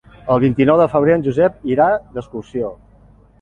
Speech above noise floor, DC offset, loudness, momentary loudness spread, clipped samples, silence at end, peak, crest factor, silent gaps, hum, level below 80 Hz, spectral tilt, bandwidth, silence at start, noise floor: 32 dB; under 0.1%; -16 LUFS; 14 LU; under 0.1%; 0.7 s; -2 dBFS; 16 dB; none; none; -46 dBFS; -9 dB/octave; 7.4 kHz; 0.25 s; -48 dBFS